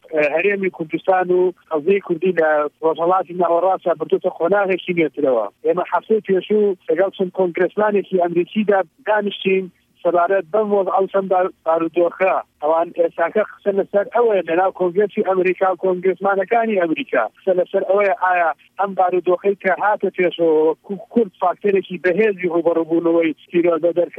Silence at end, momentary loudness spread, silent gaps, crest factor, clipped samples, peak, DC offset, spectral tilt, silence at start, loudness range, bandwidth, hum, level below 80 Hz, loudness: 0 s; 4 LU; none; 14 dB; under 0.1%; -4 dBFS; under 0.1%; -8.5 dB/octave; 0.1 s; 1 LU; 4.1 kHz; none; -70 dBFS; -18 LUFS